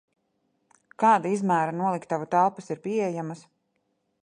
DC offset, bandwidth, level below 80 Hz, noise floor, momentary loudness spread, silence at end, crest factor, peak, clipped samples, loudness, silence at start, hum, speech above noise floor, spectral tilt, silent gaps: under 0.1%; 11 kHz; -76 dBFS; -75 dBFS; 13 LU; 0.85 s; 18 dB; -8 dBFS; under 0.1%; -25 LUFS; 1 s; none; 50 dB; -6.5 dB/octave; none